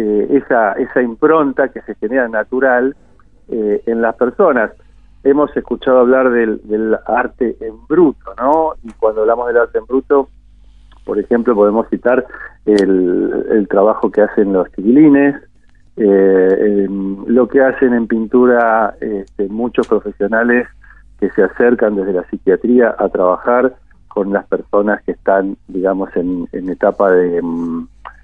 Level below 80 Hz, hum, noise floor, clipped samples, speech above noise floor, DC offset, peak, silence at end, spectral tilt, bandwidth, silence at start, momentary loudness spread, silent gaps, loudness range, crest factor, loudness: -44 dBFS; none; -43 dBFS; under 0.1%; 30 dB; 0.4%; 0 dBFS; 0.15 s; -8.5 dB/octave; 8.6 kHz; 0 s; 10 LU; none; 4 LU; 14 dB; -14 LUFS